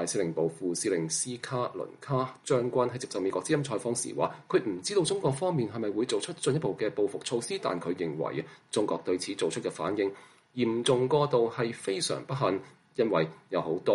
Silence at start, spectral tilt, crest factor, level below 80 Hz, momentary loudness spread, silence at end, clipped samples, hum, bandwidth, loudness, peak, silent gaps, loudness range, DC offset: 0 s; -4.5 dB/octave; 18 dB; -72 dBFS; 6 LU; 0 s; under 0.1%; none; 11.5 kHz; -30 LUFS; -12 dBFS; none; 3 LU; under 0.1%